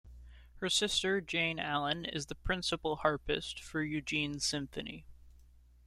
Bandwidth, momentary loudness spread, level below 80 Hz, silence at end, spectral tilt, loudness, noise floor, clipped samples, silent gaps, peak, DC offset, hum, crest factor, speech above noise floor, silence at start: 14.5 kHz; 9 LU; -52 dBFS; 0.45 s; -3 dB/octave; -34 LUFS; -60 dBFS; under 0.1%; none; -14 dBFS; under 0.1%; 60 Hz at -60 dBFS; 22 dB; 25 dB; 0.05 s